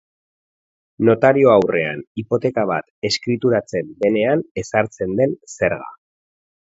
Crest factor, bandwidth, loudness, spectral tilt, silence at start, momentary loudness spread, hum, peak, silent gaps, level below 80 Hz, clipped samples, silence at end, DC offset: 18 dB; 8 kHz; -18 LUFS; -6 dB/octave; 1 s; 10 LU; none; 0 dBFS; 2.07-2.15 s, 2.90-3.02 s, 4.51-4.55 s; -54 dBFS; under 0.1%; 0.7 s; under 0.1%